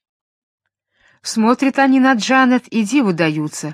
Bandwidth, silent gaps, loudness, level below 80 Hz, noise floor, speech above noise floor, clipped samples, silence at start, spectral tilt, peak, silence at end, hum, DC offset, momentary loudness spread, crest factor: 13.5 kHz; none; -15 LUFS; -68 dBFS; -59 dBFS; 45 dB; under 0.1%; 1.25 s; -4.5 dB/octave; 0 dBFS; 0 s; none; under 0.1%; 8 LU; 16 dB